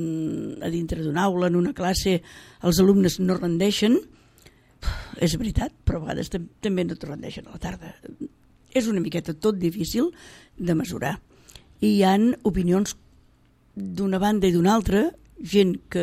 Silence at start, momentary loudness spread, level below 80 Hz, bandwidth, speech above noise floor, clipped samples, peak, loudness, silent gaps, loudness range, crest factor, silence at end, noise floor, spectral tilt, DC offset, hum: 0 s; 15 LU; -40 dBFS; 16 kHz; 36 dB; under 0.1%; -6 dBFS; -24 LUFS; none; 6 LU; 18 dB; 0 s; -58 dBFS; -6 dB/octave; under 0.1%; none